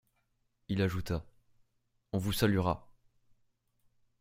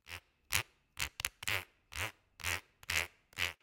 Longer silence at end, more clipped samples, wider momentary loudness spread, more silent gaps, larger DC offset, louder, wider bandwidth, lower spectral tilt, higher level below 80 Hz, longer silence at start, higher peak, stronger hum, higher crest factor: first, 1.35 s vs 0.1 s; neither; about the same, 10 LU vs 10 LU; neither; neither; first, -33 LUFS vs -38 LUFS; about the same, 16 kHz vs 17 kHz; first, -6 dB/octave vs -1 dB/octave; about the same, -54 dBFS vs -58 dBFS; first, 0.7 s vs 0.05 s; second, -12 dBFS vs -8 dBFS; neither; second, 24 dB vs 34 dB